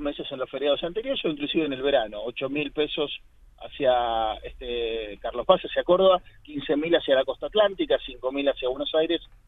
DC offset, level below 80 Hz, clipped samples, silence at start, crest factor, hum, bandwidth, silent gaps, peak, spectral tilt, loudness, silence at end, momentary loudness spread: under 0.1%; -50 dBFS; under 0.1%; 0 s; 22 dB; none; 4 kHz; none; -2 dBFS; -7 dB/octave; -25 LUFS; 0.25 s; 10 LU